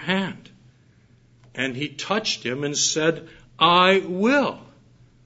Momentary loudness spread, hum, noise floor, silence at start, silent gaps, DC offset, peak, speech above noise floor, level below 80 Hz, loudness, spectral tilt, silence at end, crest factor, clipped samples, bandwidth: 17 LU; none; -56 dBFS; 0 s; none; under 0.1%; -2 dBFS; 34 dB; -62 dBFS; -21 LUFS; -3 dB/octave; 0.6 s; 22 dB; under 0.1%; 8 kHz